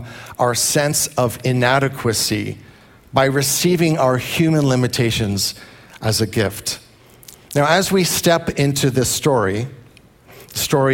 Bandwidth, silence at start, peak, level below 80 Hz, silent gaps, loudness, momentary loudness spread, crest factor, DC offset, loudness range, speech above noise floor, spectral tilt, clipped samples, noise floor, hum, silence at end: 17 kHz; 0 s; 0 dBFS; -48 dBFS; none; -17 LUFS; 10 LU; 18 dB; under 0.1%; 2 LU; 30 dB; -4 dB/octave; under 0.1%; -47 dBFS; none; 0 s